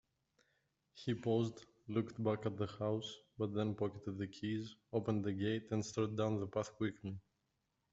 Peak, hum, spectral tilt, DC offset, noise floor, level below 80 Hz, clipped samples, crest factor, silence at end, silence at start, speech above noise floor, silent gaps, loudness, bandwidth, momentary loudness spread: -22 dBFS; none; -7 dB/octave; under 0.1%; -85 dBFS; -74 dBFS; under 0.1%; 18 dB; 0.7 s; 0.95 s; 45 dB; none; -40 LUFS; 8 kHz; 7 LU